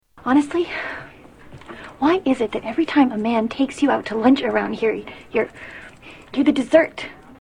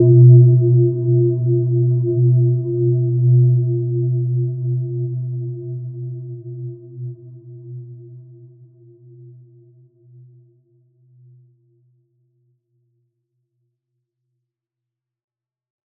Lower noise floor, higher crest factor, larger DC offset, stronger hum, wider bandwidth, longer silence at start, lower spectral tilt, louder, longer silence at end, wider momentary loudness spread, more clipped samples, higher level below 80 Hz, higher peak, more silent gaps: second, -43 dBFS vs -85 dBFS; about the same, 20 dB vs 18 dB; neither; neither; first, 10.5 kHz vs 0.7 kHz; first, 0.15 s vs 0 s; second, -5.5 dB/octave vs -19 dB/octave; second, -20 LUFS vs -16 LUFS; second, 0.05 s vs 7.8 s; second, 19 LU vs 23 LU; neither; first, -54 dBFS vs -68 dBFS; about the same, 0 dBFS vs -2 dBFS; neither